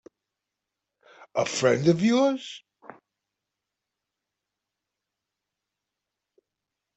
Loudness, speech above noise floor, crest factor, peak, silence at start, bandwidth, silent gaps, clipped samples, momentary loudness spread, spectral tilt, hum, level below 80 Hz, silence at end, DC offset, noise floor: -24 LUFS; 63 dB; 22 dB; -8 dBFS; 1.2 s; 8.2 kHz; none; under 0.1%; 16 LU; -5.5 dB/octave; none; -72 dBFS; 4.4 s; under 0.1%; -86 dBFS